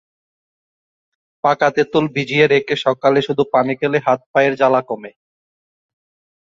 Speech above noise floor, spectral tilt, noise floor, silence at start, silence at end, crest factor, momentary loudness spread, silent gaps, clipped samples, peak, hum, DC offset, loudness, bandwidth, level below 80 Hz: over 74 dB; -6 dB/octave; under -90 dBFS; 1.45 s; 1.4 s; 18 dB; 5 LU; 4.26-4.34 s; under 0.1%; 0 dBFS; none; under 0.1%; -16 LUFS; 7.6 kHz; -62 dBFS